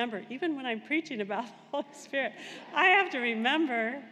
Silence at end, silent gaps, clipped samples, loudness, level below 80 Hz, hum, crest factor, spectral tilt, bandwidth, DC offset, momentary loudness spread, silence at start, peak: 0 s; none; under 0.1%; -29 LUFS; under -90 dBFS; none; 20 dB; -4 dB/octave; 11.5 kHz; under 0.1%; 15 LU; 0 s; -12 dBFS